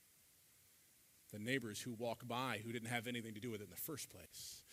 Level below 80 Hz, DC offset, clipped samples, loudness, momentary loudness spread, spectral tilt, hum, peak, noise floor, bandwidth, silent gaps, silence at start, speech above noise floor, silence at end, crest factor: -82 dBFS; under 0.1%; under 0.1%; -46 LUFS; 10 LU; -4 dB/octave; none; -24 dBFS; -70 dBFS; 16 kHz; none; 0 s; 24 dB; 0 s; 24 dB